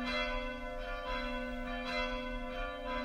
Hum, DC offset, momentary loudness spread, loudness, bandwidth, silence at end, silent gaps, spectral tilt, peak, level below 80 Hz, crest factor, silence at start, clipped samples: none; under 0.1%; 6 LU; -39 LUFS; 13.5 kHz; 0 s; none; -4.5 dB/octave; -24 dBFS; -44 dBFS; 14 dB; 0 s; under 0.1%